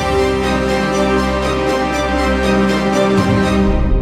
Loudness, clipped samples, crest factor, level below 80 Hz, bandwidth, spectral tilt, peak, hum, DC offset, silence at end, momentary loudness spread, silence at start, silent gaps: -15 LUFS; under 0.1%; 12 dB; -22 dBFS; 14.5 kHz; -6 dB/octave; -2 dBFS; none; under 0.1%; 0 s; 3 LU; 0 s; none